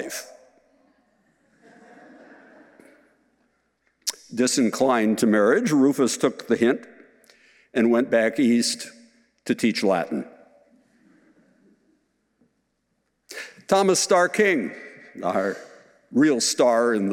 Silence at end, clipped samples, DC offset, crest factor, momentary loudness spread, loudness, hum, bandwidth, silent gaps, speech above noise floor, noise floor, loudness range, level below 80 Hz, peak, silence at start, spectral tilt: 0 s; under 0.1%; under 0.1%; 20 dB; 17 LU; -22 LUFS; none; 17 kHz; none; 53 dB; -73 dBFS; 9 LU; -76 dBFS; -4 dBFS; 0 s; -4 dB/octave